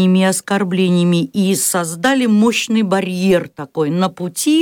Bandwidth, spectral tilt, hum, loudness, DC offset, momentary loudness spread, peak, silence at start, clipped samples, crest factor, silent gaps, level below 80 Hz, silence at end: 18 kHz; -5 dB/octave; none; -15 LUFS; under 0.1%; 6 LU; -4 dBFS; 0 s; under 0.1%; 12 dB; none; -58 dBFS; 0 s